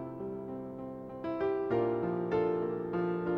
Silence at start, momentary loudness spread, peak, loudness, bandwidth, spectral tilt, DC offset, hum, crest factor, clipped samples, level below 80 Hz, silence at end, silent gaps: 0 s; 11 LU; -20 dBFS; -34 LUFS; 5.4 kHz; -9.5 dB/octave; under 0.1%; none; 14 dB; under 0.1%; -64 dBFS; 0 s; none